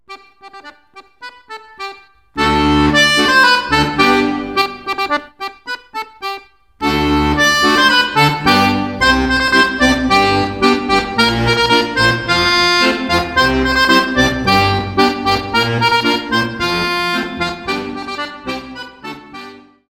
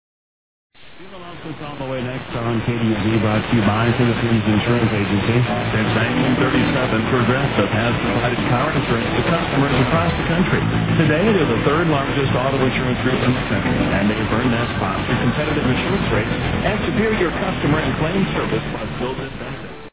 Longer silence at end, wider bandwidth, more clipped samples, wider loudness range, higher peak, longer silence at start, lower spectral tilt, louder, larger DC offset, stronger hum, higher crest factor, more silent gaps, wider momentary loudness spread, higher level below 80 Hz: first, 0.3 s vs 0.05 s; first, 17 kHz vs 4 kHz; neither; first, 6 LU vs 3 LU; first, 0 dBFS vs -4 dBFS; second, 0.1 s vs 0.85 s; second, -4 dB/octave vs -10.5 dB/octave; first, -13 LUFS vs -18 LUFS; about the same, 0.2% vs 0.3%; neither; about the same, 14 dB vs 16 dB; neither; first, 18 LU vs 8 LU; about the same, -34 dBFS vs -34 dBFS